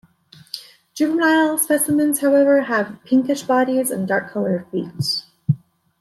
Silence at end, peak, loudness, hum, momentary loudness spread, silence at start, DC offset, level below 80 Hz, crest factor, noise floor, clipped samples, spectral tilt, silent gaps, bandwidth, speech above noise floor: 0.45 s; -4 dBFS; -19 LUFS; none; 11 LU; 0.55 s; under 0.1%; -62 dBFS; 14 dB; -49 dBFS; under 0.1%; -4.5 dB/octave; none; 14.5 kHz; 31 dB